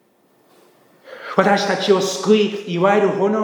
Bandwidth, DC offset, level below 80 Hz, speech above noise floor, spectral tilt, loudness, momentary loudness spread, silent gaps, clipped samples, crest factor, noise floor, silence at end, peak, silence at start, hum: 19.5 kHz; under 0.1%; -76 dBFS; 41 dB; -5 dB/octave; -17 LUFS; 5 LU; none; under 0.1%; 18 dB; -57 dBFS; 0 s; 0 dBFS; 1.05 s; none